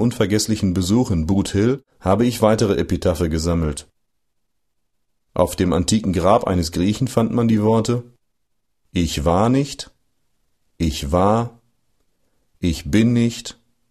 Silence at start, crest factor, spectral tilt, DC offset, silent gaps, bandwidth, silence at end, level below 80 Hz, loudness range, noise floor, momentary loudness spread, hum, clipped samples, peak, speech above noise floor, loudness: 0 s; 18 dB; -6 dB/octave; under 0.1%; none; 14 kHz; 0.4 s; -36 dBFS; 4 LU; -75 dBFS; 9 LU; none; under 0.1%; 0 dBFS; 57 dB; -19 LUFS